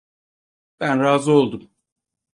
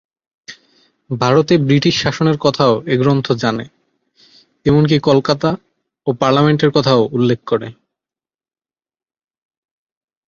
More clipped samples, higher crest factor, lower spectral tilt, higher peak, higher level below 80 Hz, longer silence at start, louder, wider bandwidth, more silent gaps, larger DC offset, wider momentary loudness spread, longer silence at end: neither; about the same, 20 dB vs 16 dB; about the same, -6 dB/octave vs -6.5 dB/octave; about the same, -2 dBFS vs 0 dBFS; second, -64 dBFS vs -50 dBFS; first, 0.8 s vs 0.5 s; second, -19 LUFS vs -15 LUFS; first, 11 kHz vs 7.4 kHz; neither; neither; about the same, 11 LU vs 10 LU; second, 0.75 s vs 2.55 s